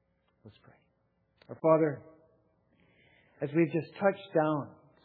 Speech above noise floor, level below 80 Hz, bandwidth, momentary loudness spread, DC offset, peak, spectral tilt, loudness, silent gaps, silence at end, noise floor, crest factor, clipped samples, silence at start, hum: 44 dB; -82 dBFS; 4.6 kHz; 18 LU; under 0.1%; -10 dBFS; -7 dB/octave; -30 LUFS; none; 0.35 s; -74 dBFS; 22 dB; under 0.1%; 0.45 s; none